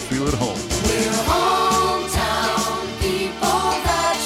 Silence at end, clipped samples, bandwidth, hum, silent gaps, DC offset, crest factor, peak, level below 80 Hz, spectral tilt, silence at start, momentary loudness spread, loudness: 0 s; under 0.1%; 16.5 kHz; none; none; under 0.1%; 14 dB; -6 dBFS; -34 dBFS; -3.5 dB/octave; 0 s; 5 LU; -20 LUFS